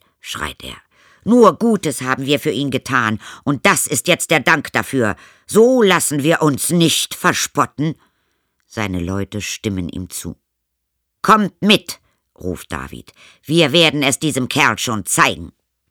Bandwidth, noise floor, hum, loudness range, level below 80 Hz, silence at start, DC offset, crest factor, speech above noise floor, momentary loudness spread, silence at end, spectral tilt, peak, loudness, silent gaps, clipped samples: over 20 kHz; -74 dBFS; none; 6 LU; -48 dBFS; 0.25 s; under 0.1%; 18 dB; 58 dB; 16 LU; 0.4 s; -3.5 dB/octave; 0 dBFS; -16 LUFS; none; under 0.1%